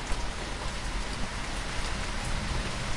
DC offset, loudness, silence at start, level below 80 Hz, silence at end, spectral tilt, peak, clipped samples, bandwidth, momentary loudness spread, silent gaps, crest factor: under 0.1%; -34 LUFS; 0 s; -34 dBFS; 0 s; -3.5 dB/octave; -16 dBFS; under 0.1%; 11.5 kHz; 2 LU; none; 16 dB